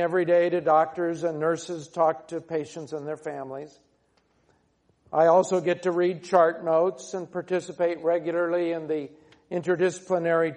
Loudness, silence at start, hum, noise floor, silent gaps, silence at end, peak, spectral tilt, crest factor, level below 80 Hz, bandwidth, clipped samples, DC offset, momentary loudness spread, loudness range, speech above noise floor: -25 LUFS; 0 s; none; -67 dBFS; none; 0 s; -6 dBFS; -6 dB/octave; 20 dB; -74 dBFS; 10 kHz; under 0.1%; under 0.1%; 13 LU; 7 LU; 42 dB